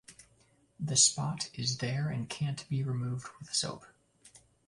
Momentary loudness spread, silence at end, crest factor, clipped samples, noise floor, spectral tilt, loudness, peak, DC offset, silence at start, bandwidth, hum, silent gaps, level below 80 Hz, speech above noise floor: 14 LU; 0.4 s; 24 dB; under 0.1%; -67 dBFS; -3 dB/octave; -31 LUFS; -10 dBFS; under 0.1%; 0.1 s; 11.5 kHz; none; none; -66 dBFS; 35 dB